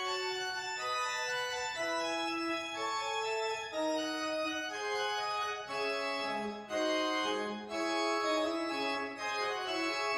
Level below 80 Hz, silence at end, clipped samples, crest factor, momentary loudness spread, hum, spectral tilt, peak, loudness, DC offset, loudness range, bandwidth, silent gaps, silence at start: -72 dBFS; 0 s; under 0.1%; 14 dB; 4 LU; none; -2 dB/octave; -20 dBFS; -35 LUFS; under 0.1%; 1 LU; 16 kHz; none; 0 s